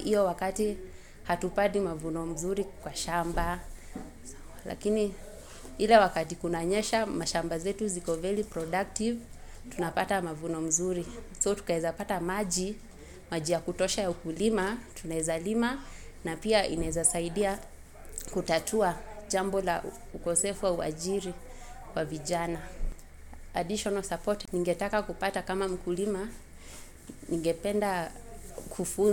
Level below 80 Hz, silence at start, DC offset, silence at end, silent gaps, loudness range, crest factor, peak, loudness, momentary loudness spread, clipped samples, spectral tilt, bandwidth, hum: -46 dBFS; 0 s; under 0.1%; 0 s; none; 5 LU; 24 dB; -8 dBFS; -31 LUFS; 17 LU; under 0.1%; -4 dB/octave; 17 kHz; none